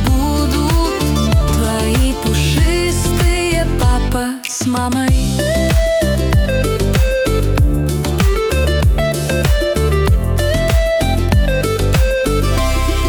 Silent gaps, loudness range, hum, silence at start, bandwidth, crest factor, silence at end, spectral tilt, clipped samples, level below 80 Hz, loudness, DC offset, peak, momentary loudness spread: none; 1 LU; none; 0 s; over 20 kHz; 12 dB; 0 s; -5.5 dB/octave; under 0.1%; -18 dBFS; -15 LUFS; under 0.1%; -2 dBFS; 2 LU